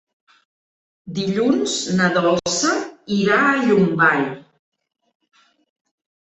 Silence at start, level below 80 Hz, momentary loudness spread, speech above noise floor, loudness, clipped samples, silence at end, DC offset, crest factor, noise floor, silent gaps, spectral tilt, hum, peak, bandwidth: 1.05 s; -60 dBFS; 10 LU; over 72 dB; -18 LUFS; under 0.1%; 1.9 s; under 0.1%; 18 dB; under -90 dBFS; none; -4.5 dB/octave; none; -2 dBFS; 8.4 kHz